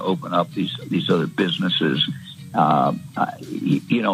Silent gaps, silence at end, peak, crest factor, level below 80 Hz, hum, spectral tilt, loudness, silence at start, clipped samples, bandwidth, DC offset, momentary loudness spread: none; 0 s; -4 dBFS; 18 dB; -66 dBFS; none; -6.5 dB/octave; -21 LUFS; 0 s; under 0.1%; 15.5 kHz; under 0.1%; 7 LU